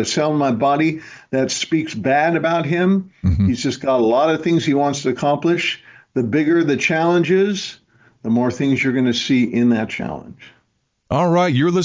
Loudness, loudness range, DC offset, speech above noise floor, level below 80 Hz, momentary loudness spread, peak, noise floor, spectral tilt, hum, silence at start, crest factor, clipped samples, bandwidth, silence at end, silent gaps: -18 LUFS; 2 LU; under 0.1%; 50 dB; -40 dBFS; 8 LU; -6 dBFS; -67 dBFS; -5.5 dB/octave; none; 0 s; 12 dB; under 0.1%; 7.6 kHz; 0 s; none